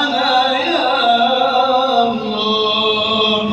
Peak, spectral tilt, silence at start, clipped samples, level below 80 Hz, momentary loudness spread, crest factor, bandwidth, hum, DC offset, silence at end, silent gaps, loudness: -2 dBFS; -4 dB/octave; 0 s; under 0.1%; -54 dBFS; 3 LU; 12 dB; 8.4 kHz; none; under 0.1%; 0 s; none; -14 LUFS